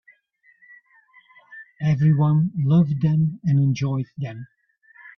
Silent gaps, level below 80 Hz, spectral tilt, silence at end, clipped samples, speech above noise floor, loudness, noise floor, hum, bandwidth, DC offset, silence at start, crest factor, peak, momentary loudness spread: none; -58 dBFS; -9 dB/octave; 0.1 s; under 0.1%; 41 dB; -21 LUFS; -60 dBFS; none; 6.2 kHz; under 0.1%; 1.5 s; 14 dB; -8 dBFS; 15 LU